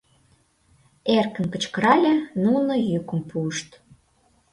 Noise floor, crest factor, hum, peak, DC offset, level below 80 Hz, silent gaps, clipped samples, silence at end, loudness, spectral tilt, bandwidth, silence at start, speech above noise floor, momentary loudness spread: -63 dBFS; 20 dB; none; -4 dBFS; under 0.1%; -62 dBFS; none; under 0.1%; 0.9 s; -22 LUFS; -5.5 dB/octave; 11.5 kHz; 1.05 s; 41 dB; 11 LU